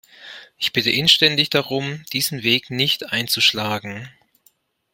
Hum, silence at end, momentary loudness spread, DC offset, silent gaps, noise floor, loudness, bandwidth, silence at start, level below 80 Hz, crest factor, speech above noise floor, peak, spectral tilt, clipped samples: none; 0.85 s; 20 LU; under 0.1%; none; -61 dBFS; -18 LUFS; 16.5 kHz; 0.2 s; -60 dBFS; 22 dB; 41 dB; 0 dBFS; -3 dB/octave; under 0.1%